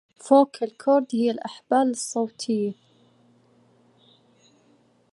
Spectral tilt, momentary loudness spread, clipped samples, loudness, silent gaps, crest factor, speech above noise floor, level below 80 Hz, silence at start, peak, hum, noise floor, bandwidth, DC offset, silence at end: -4.5 dB/octave; 9 LU; under 0.1%; -23 LUFS; none; 22 dB; 39 dB; -82 dBFS; 0.25 s; -4 dBFS; none; -61 dBFS; 11.5 kHz; under 0.1%; 2.4 s